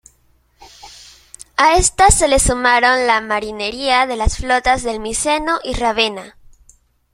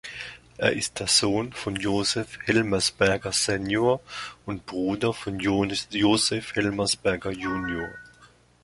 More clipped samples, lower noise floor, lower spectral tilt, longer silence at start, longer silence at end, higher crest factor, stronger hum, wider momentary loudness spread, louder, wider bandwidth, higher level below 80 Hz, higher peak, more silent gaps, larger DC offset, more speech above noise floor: neither; about the same, -57 dBFS vs -56 dBFS; about the same, -2.5 dB/octave vs -3.5 dB/octave; first, 0.6 s vs 0.05 s; first, 0.85 s vs 0.4 s; second, 16 dB vs 22 dB; second, none vs 60 Hz at -55 dBFS; second, 9 LU vs 14 LU; first, -15 LUFS vs -25 LUFS; first, 16 kHz vs 11.5 kHz; first, -28 dBFS vs -52 dBFS; first, 0 dBFS vs -4 dBFS; neither; neither; first, 41 dB vs 30 dB